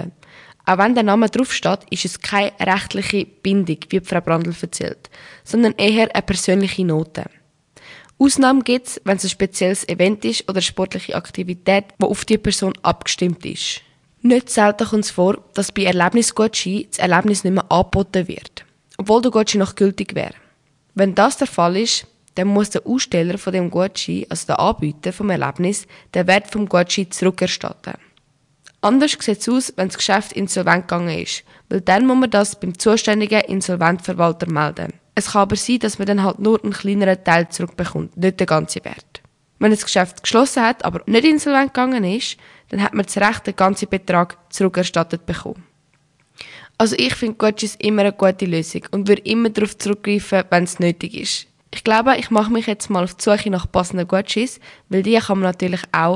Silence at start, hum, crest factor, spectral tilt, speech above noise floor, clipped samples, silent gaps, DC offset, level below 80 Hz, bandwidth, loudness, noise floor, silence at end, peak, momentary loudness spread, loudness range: 0 s; none; 18 dB; -4.5 dB/octave; 42 dB; under 0.1%; none; under 0.1%; -48 dBFS; 11.5 kHz; -18 LUFS; -60 dBFS; 0 s; 0 dBFS; 10 LU; 3 LU